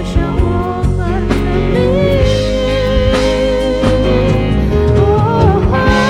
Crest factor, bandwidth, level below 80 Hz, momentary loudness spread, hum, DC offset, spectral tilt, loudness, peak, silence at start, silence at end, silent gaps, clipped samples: 12 dB; 12 kHz; -18 dBFS; 4 LU; none; under 0.1%; -7 dB/octave; -13 LUFS; 0 dBFS; 0 s; 0 s; none; under 0.1%